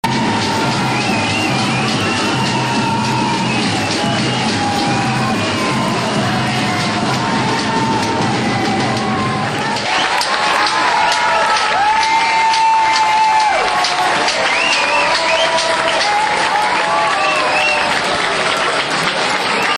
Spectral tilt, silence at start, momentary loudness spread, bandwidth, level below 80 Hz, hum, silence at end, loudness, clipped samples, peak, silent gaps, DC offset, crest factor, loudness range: -3.5 dB/octave; 0.05 s; 4 LU; 13.5 kHz; -46 dBFS; none; 0 s; -14 LUFS; under 0.1%; -2 dBFS; none; under 0.1%; 14 dB; 3 LU